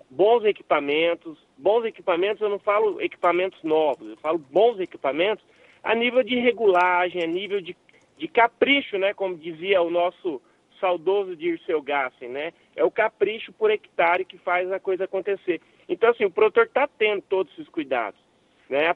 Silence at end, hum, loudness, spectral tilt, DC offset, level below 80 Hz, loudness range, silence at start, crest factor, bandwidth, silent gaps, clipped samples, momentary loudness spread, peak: 0 s; none; -23 LUFS; -6 dB/octave; under 0.1%; -72 dBFS; 3 LU; 0.1 s; 18 dB; 5.2 kHz; none; under 0.1%; 11 LU; -6 dBFS